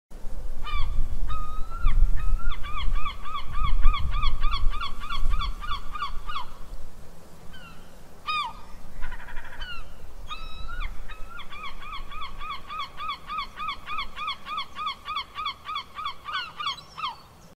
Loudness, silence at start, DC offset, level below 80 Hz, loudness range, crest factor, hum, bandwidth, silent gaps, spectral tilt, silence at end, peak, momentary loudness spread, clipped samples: -33 LUFS; 0.1 s; under 0.1%; -28 dBFS; 7 LU; 18 dB; none; 5.8 kHz; none; -4 dB/octave; 0.45 s; -2 dBFS; 17 LU; under 0.1%